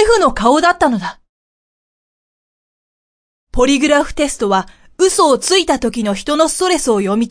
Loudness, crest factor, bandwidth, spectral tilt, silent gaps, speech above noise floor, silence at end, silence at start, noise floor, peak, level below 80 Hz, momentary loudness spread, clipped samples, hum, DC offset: -14 LUFS; 14 dB; 10.5 kHz; -3.5 dB/octave; 1.29-3.47 s; over 76 dB; 0 s; 0 s; under -90 dBFS; 0 dBFS; -34 dBFS; 7 LU; under 0.1%; none; under 0.1%